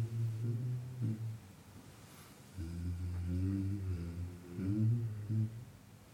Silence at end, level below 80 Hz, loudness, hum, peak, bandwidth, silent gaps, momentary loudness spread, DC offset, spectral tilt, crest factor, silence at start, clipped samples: 0 s; -56 dBFS; -39 LUFS; none; -24 dBFS; 16 kHz; none; 20 LU; under 0.1%; -8.5 dB/octave; 16 dB; 0 s; under 0.1%